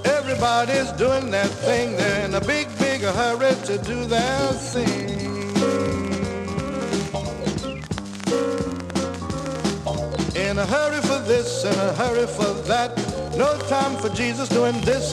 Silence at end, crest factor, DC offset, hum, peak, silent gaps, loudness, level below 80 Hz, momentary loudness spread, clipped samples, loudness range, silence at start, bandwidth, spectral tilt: 0 s; 16 dB; under 0.1%; none; -8 dBFS; none; -23 LUFS; -42 dBFS; 6 LU; under 0.1%; 5 LU; 0 s; 13.5 kHz; -4.5 dB/octave